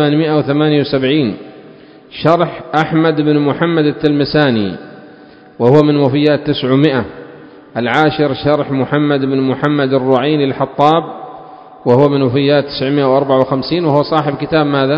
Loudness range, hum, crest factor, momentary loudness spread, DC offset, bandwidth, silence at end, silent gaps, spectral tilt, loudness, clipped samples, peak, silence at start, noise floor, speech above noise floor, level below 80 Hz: 1 LU; none; 14 dB; 8 LU; under 0.1%; 7.4 kHz; 0 s; none; -8.5 dB/octave; -13 LUFS; 0.2%; 0 dBFS; 0 s; -39 dBFS; 27 dB; -48 dBFS